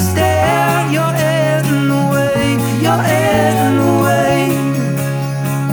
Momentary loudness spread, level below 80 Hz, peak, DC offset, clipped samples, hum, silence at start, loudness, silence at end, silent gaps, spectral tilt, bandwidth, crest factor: 5 LU; -42 dBFS; -2 dBFS; under 0.1%; under 0.1%; none; 0 s; -14 LUFS; 0 s; none; -6 dB/octave; over 20 kHz; 12 dB